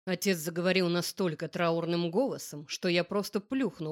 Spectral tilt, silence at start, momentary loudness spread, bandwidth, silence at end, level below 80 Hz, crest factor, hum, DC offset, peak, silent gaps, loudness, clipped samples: -5 dB/octave; 0.05 s; 6 LU; 17 kHz; 0 s; -74 dBFS; 16 dB; none; under 0.1%; -14 dBFS; none; -31 LUFS; under 0.1%